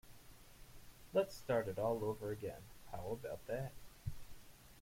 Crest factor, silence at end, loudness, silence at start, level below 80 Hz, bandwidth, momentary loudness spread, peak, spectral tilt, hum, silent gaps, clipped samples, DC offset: 20 dB; 0 s; -43 LUFS; 0.05 s; -60 dBFS; 16.5 kHz; 22 LU; -24 dBFS; -6 dB/octave; none; none; under 0.1%; under 0.1%